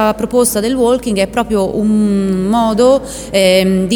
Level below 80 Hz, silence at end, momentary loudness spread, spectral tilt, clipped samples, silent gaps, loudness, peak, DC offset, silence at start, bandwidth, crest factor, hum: -36 dBFS; 0 s; 5 LU; -5 dB/octave; under 0.1%; none; -13 LUFS; 0 dBFS; under 0.1%; 0 s; 19 kHz; 12 dB; none